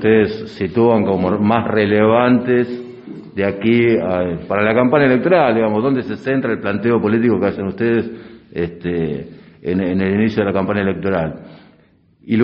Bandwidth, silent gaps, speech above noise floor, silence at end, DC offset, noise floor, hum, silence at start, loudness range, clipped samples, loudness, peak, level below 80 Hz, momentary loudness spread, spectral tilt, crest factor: 5.8 kHz; none; 37 dB; 0 s; under 0.1%; -53 dBFS; none; 0 s; 4 LU; under 0.1%; -16 LUFS; 0 dBFS; -48 dBFS; 12 LU; -6 dB/octave; 16 dB